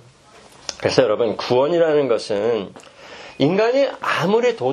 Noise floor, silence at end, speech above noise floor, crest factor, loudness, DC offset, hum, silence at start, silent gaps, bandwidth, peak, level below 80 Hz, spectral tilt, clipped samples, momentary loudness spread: -47 dBFS; 0 s; 29 dB; 20 dB; -19 LUFS; under 0.1%; none; 0.7 s; none; 12.5 kHz; 0 dBFS; -60 dBFS; -5.5 dB/octave; under 0.1%; 16 LU